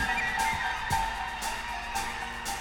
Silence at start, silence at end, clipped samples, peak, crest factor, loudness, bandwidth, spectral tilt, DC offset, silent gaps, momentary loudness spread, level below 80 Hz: 0 s; 0 s; under 0.1%; -16 dBFS; 16 dB; -30 LUFS; 19 kHz; -2 dB/octave; under 0.1%; none; 6 LU; -44 dBFS